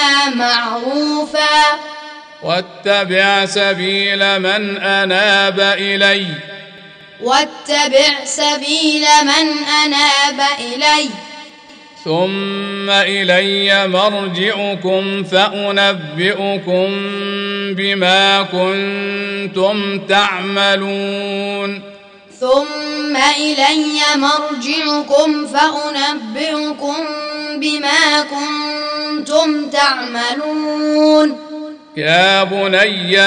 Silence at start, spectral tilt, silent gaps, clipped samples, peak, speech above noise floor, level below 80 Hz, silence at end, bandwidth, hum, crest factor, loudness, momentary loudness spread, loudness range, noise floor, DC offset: 0 s; -3 dB/octave; none; under 0.1%; 0 dBFS; 25 dB; -62 dBFS; 0 s; 10.5 kHz; none; 14 dB; -14 LUFS; 10 LU; 4 LU; -39 dBFS; under 0.1%